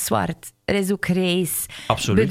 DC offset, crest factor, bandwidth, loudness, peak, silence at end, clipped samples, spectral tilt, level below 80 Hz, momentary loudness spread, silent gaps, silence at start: under 0.1%; 18 dB; 16.5 kHz; -22 LUFS; -2 dBFS; 0 s; under 0.1%; -4.5 dB/octave; -46 dBFS; 6 LU; none; 0 s